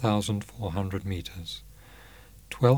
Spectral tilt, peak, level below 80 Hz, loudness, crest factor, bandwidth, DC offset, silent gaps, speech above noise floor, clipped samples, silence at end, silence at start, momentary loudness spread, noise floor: -6.5 dB/octave; -6 dBFS; -50 dBFS; -32 LUFS; 22 dB; over 20 kHz; under 0.1%; none; 21 dB; under 0.1%; 0 s; 0 s; 24 LU; -51 dBFS